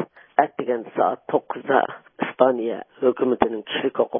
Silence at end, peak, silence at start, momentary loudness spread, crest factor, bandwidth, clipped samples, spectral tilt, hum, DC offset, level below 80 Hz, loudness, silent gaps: 0 s; 0 dBFS; 0 s; 8 LU; 22 dB; 3.7 kHz; under 0.1%; -9.5 dB/octave; none; under 0.1%; -60 dBFS; -23 LUFS; none